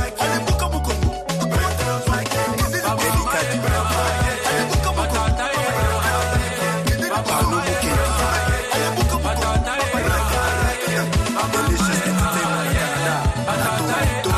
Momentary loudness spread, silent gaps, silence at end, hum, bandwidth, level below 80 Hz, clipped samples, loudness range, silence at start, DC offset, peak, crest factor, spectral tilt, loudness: 2 LU; none; 0 s; none; 14.5 kHz; -26 dBFS; under 0.1%; 1 LU; 0 s; under 0.1%; -8 dBFS; 12 dB; -4.5 dB/octave; -20 LUFS